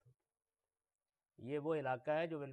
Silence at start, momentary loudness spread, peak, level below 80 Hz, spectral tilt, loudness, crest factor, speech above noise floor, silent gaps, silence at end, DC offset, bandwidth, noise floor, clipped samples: 1.4 s; 7 LU; -28 dBFS; -86 dBFS; -8 dB/octave; -41 LUFS; 16 dB; over 50 dB; none; 0 s; under 0.1%; 9.4 kHz; under -90 dBFS; under 0.1%